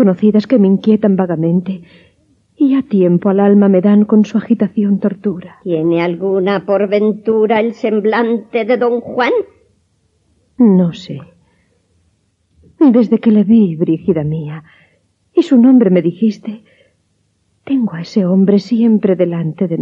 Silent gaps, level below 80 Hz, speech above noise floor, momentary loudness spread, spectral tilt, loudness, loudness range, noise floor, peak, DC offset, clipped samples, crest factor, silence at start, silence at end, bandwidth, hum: none; -58 dBFS; 49 dB; 11 LU; -9 dB/octave; -13 LUFS; 4 LU; -61 dBFS; 0 dBFS; under 0.1%; under 0.1%; 12 dB; 0 s; 0 s; 7 kHz; none